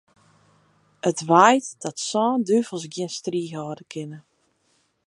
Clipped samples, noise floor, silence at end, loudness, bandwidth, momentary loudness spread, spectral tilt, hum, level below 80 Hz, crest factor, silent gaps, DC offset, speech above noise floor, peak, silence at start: under 0.1%; -67 dBFS; 0.9 s; -22 LUFS; 11.5 kHz; 18 LU; -4.5 dB/octave; none; -74 dBFS; 22 dB; none; under 0.1%; 45 dB; -2 dBFS; 1.05 s